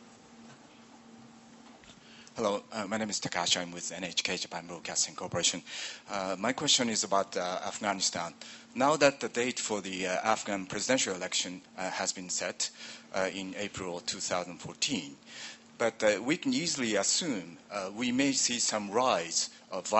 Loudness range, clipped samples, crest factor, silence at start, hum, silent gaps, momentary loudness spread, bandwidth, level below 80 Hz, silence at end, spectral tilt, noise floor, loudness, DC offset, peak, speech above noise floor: 5 LU; under 0.1%; 26 dB; 0 s; none; none; 12 LU; 8.4 kHz; -70 dBFS; 0 s; -2 dB/octave; -55 dBFS; -31 LUFS; under 0.1%; -6 dBFS; 23 dB